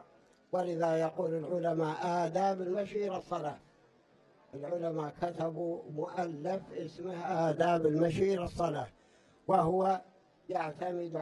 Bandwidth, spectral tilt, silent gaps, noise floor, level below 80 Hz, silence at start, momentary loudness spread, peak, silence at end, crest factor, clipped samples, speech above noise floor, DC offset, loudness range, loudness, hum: 11.5 kHz; -7 dB/octave; none; -65 dBFS; -64 dBFS; 0.5 s; 11 LU; -16 dBFS; 0 s; 18 dB; under 0.1%; 32 dB; under 0.1%; 7 LU; -34 LUFS; none